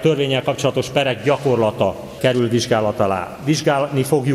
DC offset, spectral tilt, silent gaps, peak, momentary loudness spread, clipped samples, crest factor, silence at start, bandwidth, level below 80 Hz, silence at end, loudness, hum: under 0.1%; -5.5 dB/octave; none; -2 dBFS; 4 LU; under 0.1%; 16 dB; 0 s; 15.5 kHz; -52 dBFS; 0 s; -18 LUFS; none